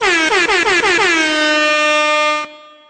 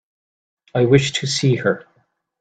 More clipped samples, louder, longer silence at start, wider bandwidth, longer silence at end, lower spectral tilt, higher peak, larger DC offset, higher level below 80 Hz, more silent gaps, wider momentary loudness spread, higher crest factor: neither; first, -12 LUFS vs -18 LUFS; second, 0 s vs 0.75 s; about the same, 9.4 kHz vs 9.2 kHz; second, 0.35 s vs 0.6 s; second, -1 dB/octave vs -5 dB/octave; about the same, -2 dBFS vs 0 dBFS; neither; first, -48 dBFS vs -56 dBFS; neither; second, 4 LU vs 10 LU; second, 12 dB vs 20 dB